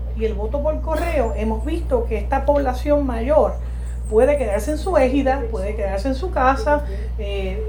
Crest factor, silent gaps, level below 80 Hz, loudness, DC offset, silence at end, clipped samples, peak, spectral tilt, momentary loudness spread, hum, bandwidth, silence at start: 16 dB; none; -24 dBFS; -20 LUFS; under 0.1%; 0 s; under 0.1%; -2 dBFS; -7 dB/octave; 8 LU; none; 19 kHz; 0 s